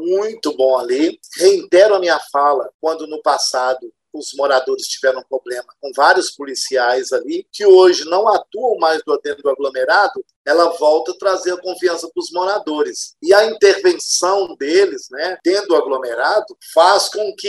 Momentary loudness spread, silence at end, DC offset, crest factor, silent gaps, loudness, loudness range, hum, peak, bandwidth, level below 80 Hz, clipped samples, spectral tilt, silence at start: 11 LU; 0 s; under 0.1%; 16 dB; 2.74-2.79 s, 10.36-10.45 s; -16 LUFS; 4 LU; none; 0 dBFS; 12.5 kHz; -70 dBFS; under 0.1%; -1.5 dB/octave; 0 s